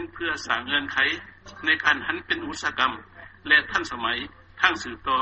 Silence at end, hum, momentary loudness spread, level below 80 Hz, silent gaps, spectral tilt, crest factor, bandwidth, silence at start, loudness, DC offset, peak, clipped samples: 0 s; none; 11 LU; -54 dBFS; none; -2.5 dB/octave; 22 dB; 8.2 kHz; 0 s; -24 LUFS; under 0.1%; -4 dBFS; under 0.1%